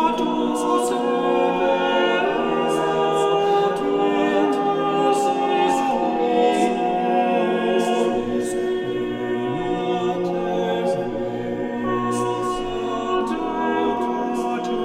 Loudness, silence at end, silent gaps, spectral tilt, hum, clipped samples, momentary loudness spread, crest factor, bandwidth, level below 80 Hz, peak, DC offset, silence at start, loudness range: -21 LUFS; 0 s; none; -5 dB/octave; none; under 0.1%; 5 LU; 14 dB; 14.5 kHz; -50 dBFS; -6 dBFS; under 0.1%; 0 s; 4 LU